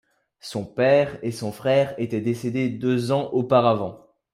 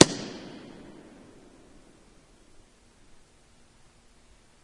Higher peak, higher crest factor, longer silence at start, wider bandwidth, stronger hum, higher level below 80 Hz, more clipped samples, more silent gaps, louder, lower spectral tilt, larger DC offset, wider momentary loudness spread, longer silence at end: second, -4 dBFS vs 0 dBFS; second, 18 dB vs 32 dB; first, 0.45 s vs 0 s; first, 15 kHz vs 12 kHz; neither; about the same, -62 dBFS vs -60 dBFS; neither; neither; first, -23 LUFS vs -28 LUFS; first, -6.5 dB/octave vs -4 dB/octave; neither; second, 12 LU vs 22 LU; second, 0.35 s vs 4.25 s